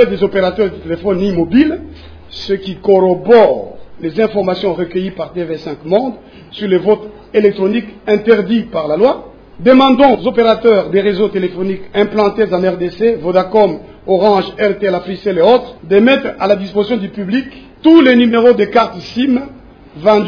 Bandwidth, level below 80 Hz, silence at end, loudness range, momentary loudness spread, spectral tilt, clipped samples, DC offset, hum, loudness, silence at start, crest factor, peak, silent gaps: 5.4 kHz; -42 dBFS; 0 s; 5 LU; 12 LU; -7.5 dB/octave; 0.4%; under 0.1%; none; -13 LUFS; 0 s; 12 dB; 0 dBFS; none